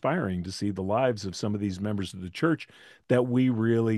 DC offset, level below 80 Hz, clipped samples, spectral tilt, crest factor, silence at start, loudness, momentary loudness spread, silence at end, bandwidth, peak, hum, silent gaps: under 0.1%; -66 dBFS; under 0.1%; -7 dB/octave; 18 dB; 0.05 s; -28 LUFS; 8 LU; 0 s; 12.5 kHz; -10 dBFS; none; none